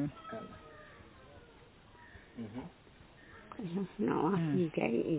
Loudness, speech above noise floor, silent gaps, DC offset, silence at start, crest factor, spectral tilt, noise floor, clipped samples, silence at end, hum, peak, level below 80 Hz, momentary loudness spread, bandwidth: -36 LUFS; 26 dB; none; under 0.1%; 0 s; 20 dB; -7 dB/octave; -59 dBFS; under 0.1%; 0 s; none; -16 dBFS; -64 dBFS; 25 LU; 4 kHz